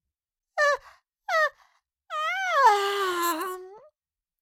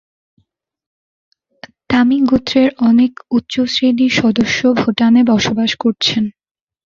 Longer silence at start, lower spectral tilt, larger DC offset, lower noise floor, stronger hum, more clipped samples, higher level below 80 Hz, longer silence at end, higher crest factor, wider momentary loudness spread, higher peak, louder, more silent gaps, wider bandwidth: second, 0.55 s vs 1.9 s; second, 0 dB/octave vs -5 dB/octave; neither; first, under -90 dBFS vs -62 dBFS; neither; neither; second, -74 dBFS vs -48 dBFS; about the same, 0.65 s vs 0.55 s; first, 20 dB vs 14 dB; first, 16 LU vs 5 LU; second, -8 dBFS vs 0 dBFS; second, -25 LUFS vs -14 LUFS; neither; first, 17 kHz vs 7.4 kHz